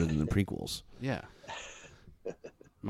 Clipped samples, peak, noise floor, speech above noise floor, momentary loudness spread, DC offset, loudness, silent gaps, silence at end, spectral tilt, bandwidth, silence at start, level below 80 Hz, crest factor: under 0.1%; -16 dBFS; -54 dBFS; 20 dB; 21 LU; under 0.1%; -36 LUFS; none; 0 s; -6 dB/octave; 16 kHz; 0 s; -48 dBFS; 20 dB